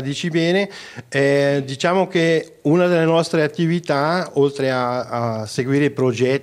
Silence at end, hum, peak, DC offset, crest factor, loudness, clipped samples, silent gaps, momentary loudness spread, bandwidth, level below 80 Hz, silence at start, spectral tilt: 0 s; none; -2 dBFS; under 0.1%; 16 dB; -19 LUFS; under 0.1%; none; 7 LU; 13.5 kHz; -64 dBFS; 0 s; -6 dB/octave